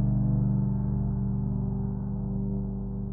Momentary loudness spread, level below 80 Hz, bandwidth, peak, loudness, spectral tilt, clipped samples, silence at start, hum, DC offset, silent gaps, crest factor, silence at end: 7 LU; -36 dBFS; 1.7 kHz; -16 dBFS; -29 LUFS; -14 dB/octave; under 0.1%; 0 s; 50 Hz at -60 dBFS; under 0.1%; none; 12 dB; 0 s